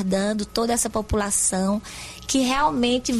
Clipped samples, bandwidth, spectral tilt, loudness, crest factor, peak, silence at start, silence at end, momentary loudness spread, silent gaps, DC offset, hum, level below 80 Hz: under 0.1%; 14 kHz; -3.5 dB/octave; -22 LUFS; 14 dB; -8 dBFS; 0 s; 0 s; 7 LU; none; under 0.1%; none; -42 dBFS